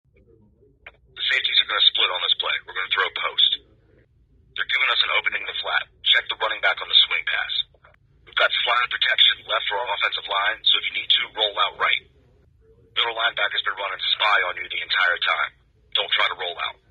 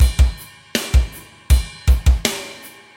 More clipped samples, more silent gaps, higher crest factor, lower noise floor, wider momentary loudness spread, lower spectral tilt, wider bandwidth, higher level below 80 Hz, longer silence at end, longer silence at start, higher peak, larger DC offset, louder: neither; neither; first, 22 dB vs 16 dB; first, -57 dBFS vs -39 dBFS; second, 10 LU vs 19 LU; second, -1 dB/octave vs -4.5 dB/octave; second, 7.8 kHz vs 16.5 kHz; second, -62 dBFS vs -18 dBFS; about the same, 0.2 s vs 0.3 s; first, 0.85 s vs 0 s; about the same, -2 dBFS vs -2 dBFS; neither; about the same, -20 LUFS vs -19 LUFS